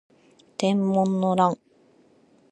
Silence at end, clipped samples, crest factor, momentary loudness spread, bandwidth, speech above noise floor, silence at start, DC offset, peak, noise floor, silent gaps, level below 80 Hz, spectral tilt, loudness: 0.95 s; under 0.1%; 20 dB; 12 LU; 10.5 kHz; 37 dB; 0.6 s; under 0.1%; -6 dBFS; -59 dBFS; none; -70 dBFS; -7 dB/octave; -23 LUFS